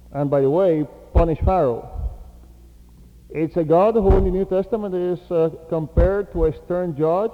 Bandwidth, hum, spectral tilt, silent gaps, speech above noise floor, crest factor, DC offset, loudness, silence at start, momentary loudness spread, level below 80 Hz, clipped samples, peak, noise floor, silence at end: 6 kHz; none; -10 dB/octave; none; 27 dB; 16 dB; under 0.1%; -20 LUFS; 0.1 s; 10 LU; -28 dBFS; under 0.1%; -2 dBFS; -46 dBFS; 0 s